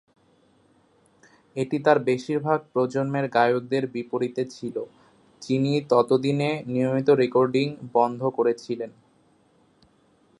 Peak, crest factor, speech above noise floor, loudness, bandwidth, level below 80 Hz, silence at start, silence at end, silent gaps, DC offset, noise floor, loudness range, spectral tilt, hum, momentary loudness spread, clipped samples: -4 dBFS; 20 dB; 38 dB; -24 LUFS; 11 kHz; -72 dBFS; 1.55 s; 1.5 s; none; under 0.1%; -61 dBFS; 4 LU; -7 dB/octave; none; 12 LU; under 0.1%